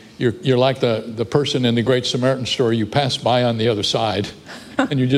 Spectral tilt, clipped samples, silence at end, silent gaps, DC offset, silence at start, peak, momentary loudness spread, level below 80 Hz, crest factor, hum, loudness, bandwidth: -5.5 dB/octave; under 0.1%; 0 s; none; under 0.1%; 0.05 s; -2 dBFS; 6 LU; -52 dBFS; 16 dB; none; -19 LUFS; 12.5 kHz